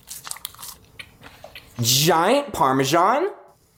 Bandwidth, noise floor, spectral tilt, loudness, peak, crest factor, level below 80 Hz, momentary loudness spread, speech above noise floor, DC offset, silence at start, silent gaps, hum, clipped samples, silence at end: 17 kHz; -45 dBFS; -3.5 dB/octave; -19 LUFS; -4 dBFS; 18 dB; -56 dBFS; 24 LU; 26 dB; under 0.1%; 0.1 s; none; none; under 0.1%; 0.4 s